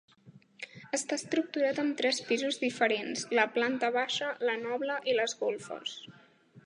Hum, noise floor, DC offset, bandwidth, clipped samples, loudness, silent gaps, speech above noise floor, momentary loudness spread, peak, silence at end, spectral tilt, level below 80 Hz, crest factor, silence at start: none; -59 dBFS; under 0.1%; 11.5 kHz; under 0.1%; -31 LUFS; none; 27 dB; 10 LU; -10 dBFS; 0.05 s; -2.5 dB/octave; -84 dBFS; 22 dB; 0.25 s